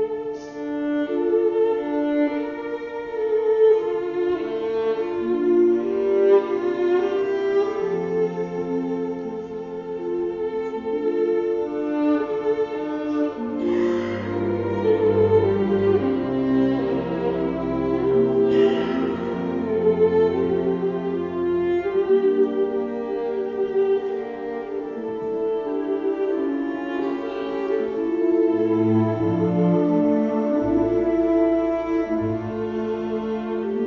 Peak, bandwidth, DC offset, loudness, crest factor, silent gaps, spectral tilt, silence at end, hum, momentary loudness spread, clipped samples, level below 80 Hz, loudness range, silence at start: -6 dBFS; 6.8 kHz; under 0.1%; -22 LUFS; 14 dB; none; -9 dB/octave; 0 s; none; 9 LU; under 0.1%; -52 dBFS; 5 LU; 0 s